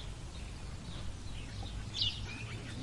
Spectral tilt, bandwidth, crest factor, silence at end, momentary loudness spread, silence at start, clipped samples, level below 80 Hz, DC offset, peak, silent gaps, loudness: -4 dB/octave; 11.5 kHz; 20 dB; 0 s; 12 LU; 0 s; under 0.1%; -48 dBFS; under 0.1%; -20 dBFS; none; -41 LUFS